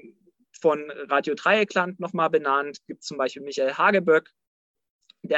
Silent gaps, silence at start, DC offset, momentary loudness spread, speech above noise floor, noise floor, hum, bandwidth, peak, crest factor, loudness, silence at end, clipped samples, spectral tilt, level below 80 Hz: 4.47-4.74 s, 4.90-4.99 s; 0.05 s; under 0.1%; 10 LU; 32 dB; -56 dBFS; none; 8 kHz; -6 dBFS; 18 dB; -23 LUFS; 0 s; under 0.1%; -4.5 dB/octave; -76 dBFS